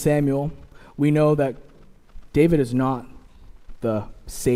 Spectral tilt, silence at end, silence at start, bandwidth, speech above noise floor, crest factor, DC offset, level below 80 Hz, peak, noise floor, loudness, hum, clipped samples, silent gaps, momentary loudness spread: -7.5 dB/octave; 0 s; 0 s; 16 kHz; 24 dB; 18 dB; under 0.1%; -42 dBFS; -4 dBFS; -45 dBFS; -22 LUFS; none; under 0.1%; none; 13 LU